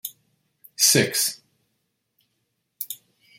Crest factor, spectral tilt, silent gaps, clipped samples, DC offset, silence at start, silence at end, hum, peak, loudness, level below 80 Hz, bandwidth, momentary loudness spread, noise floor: 24 dB; -2 dB/octave; none; under 0.1%; under 0.1%; 0.05 s; 0.45 s; none; -4 dBFS; -19 LUFS; -70 dBFS; 16.5 kHz; 23 LU; -75 dBFS